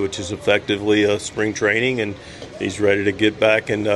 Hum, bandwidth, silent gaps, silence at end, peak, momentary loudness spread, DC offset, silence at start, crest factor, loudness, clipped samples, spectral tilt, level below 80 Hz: none; 12 kHz; none; 0 s; -2 dBFS; 10 LU; under 0.1%; 0 s; 18 dB; -19 LUFS; under 0.1%; -4.5 dB/octave; -50 dBFS